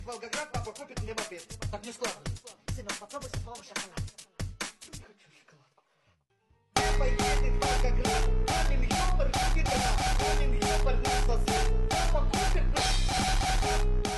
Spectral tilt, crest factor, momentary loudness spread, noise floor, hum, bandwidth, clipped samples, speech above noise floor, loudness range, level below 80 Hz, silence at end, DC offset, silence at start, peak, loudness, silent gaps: -3.5 dB/octave; 18 dB; 12 LU; -70 dBFS; none; 12.5 kHz; under 0.1%; 42 dB; 11 LU; -30 dBFS; 0 s; under 0.1%; 0 s; -10 dBFS; -30 LUFS; none